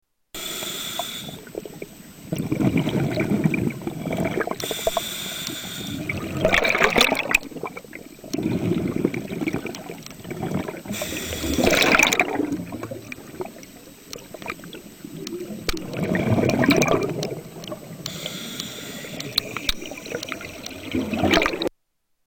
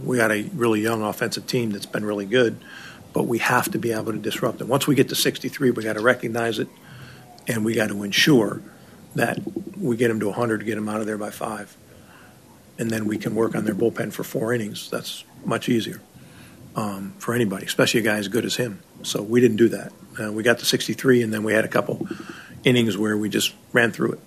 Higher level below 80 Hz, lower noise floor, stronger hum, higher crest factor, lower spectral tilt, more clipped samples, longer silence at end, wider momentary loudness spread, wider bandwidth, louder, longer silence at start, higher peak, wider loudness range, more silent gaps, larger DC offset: first, -44 dBFS vs -62 dBFS; first, -70 dBFS vs -49 dBFS; neither; about the same, 22 dB vs 20 dB; about the same, -4 dB/octave vs -4.5 dB/octave; neither; first, 0.6 s vs 0.05 s; first, 18 LU vs 13 LU; first, over 20 kHz vs 15.5 kHz; about the same, -24 LUFS vs -23 LUFS; first, 0.35 s vs 0 s; about the same, -4 dBFS vs -4 dBFS; about the same, 7 LU vs 5 LU; neither; neither